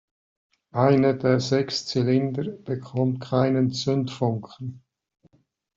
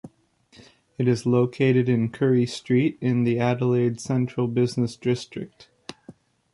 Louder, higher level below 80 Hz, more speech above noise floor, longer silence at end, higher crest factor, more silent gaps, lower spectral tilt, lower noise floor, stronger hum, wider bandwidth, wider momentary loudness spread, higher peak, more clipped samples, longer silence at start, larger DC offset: about the same, -24 LUFS vs -23 LUFS; about the same, -62 dBFS vs -60 dBFS; first, 41 dB vs 37 dB; first, 1 s vs 0.4 s; about the same, 18 dB vs 16 dB; neither; about the same, -6.5 dB/octave vs -7.5 dB/octave; first, -64 dBFS vs -59 dBFS; neither; second, 7.6 kHz vs 11.5 kHz; second, 12 LU vs 16 LU; about the same, -6 dBFS vs -8 dBFS; neither; first, 0.75 s vs 0.05 s; neither